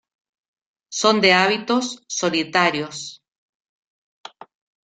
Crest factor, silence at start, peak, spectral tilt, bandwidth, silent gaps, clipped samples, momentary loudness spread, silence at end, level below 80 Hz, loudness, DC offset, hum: 22 dB; 0.9 s; -2 dBFS; -3 dB/octave; 9.4 kHz; none; under 0.1%; 16 LU; 1.7 s; -66 dBFS; -18 LUFS; under 0.1%; none